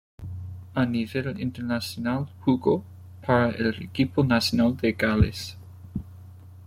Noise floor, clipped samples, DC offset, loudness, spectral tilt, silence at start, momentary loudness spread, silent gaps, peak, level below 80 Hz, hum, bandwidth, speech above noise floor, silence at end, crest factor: -45 dBFS; under 0.1%; under 0.1%; -25 LUFS; -6.5 dB/octave; 0.2 s; 16 LU; none; -8 dBFS; -46 dBFS; none; 16 kHz; 21 dB; 0 s; 18 dB